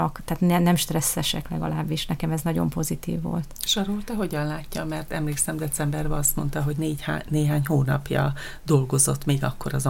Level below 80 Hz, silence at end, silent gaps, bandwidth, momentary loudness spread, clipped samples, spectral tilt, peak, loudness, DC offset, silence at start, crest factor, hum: -38 dBFS; 0 s; none; 17 kHz; 8 LU; under 0.1%; -4.5 dB/octave; -6 dBFS; -25 LUFS; under 0.1%; 0 s; 18 dB; none